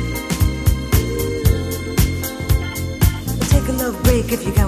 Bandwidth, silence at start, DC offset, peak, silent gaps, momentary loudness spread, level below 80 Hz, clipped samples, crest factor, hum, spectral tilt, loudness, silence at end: 16 kHz; 0 s; under 0.1%; 0 dBFS; none; 5 LU; -22 dBFS; under 0.1%; 18 dB; none; -5.5 dB/octave; -19 LUFS; 0 s